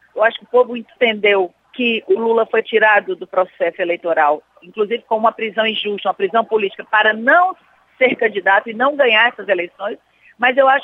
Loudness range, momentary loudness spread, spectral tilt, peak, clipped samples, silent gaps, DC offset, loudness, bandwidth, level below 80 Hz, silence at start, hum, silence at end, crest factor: 3 LU; 9 LU; -6 dB/octave; -2 dBFS; under 0.1%; none; under 0.1%; -16 LUFS; 5.4 kHz; -74 dBFS; 0.15 s; none; 0 s; 14 dB